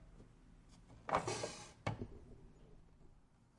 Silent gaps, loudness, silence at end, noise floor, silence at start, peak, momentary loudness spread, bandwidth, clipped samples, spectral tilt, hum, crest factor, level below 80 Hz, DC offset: none; -44 LUFS; 0.3 s; -66 dBFS; 0 s; -20 dBFS; 26 LU; 11.5 kHz; under 0.1%; -4.5 dB/octave; none; 28 dB; -62 dBFS; under 0.1%